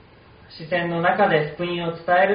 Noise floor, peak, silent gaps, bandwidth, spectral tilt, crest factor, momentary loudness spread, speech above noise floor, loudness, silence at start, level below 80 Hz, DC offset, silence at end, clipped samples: -49 dBFS; -4 dBFS; none; 5.2 kHz; -3.5 dB/octave; 18 dB; 8 LU; 28 dB; -21 LUFS; 0.5 s; -56 dBFS; under 0.1%; 0 s; under 0.1%